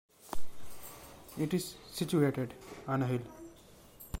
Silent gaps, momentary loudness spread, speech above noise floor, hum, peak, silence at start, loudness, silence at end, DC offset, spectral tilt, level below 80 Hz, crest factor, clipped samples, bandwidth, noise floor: none; 22 LU; 23 dB; none; -16 dBFS; 0.2 s; -35 LUFS; 0 s; under 0.1%; -6 dB/octave; -54 dBFS; 18 dB; under 0.1%; 16.5 kHz; -57 dBFS